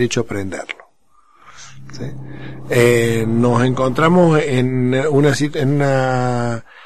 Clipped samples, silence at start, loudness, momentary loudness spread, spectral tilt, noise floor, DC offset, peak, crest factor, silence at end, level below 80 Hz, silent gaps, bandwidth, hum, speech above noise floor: under 0.1%; 0 s; -16 LUFS; 18 LU; -6.5 dB/octave; -56 dBFS; 3%; 0 dBFS; 16 dB; 0 s; -46 dBFS; none; 13 kHz; none; 41 dB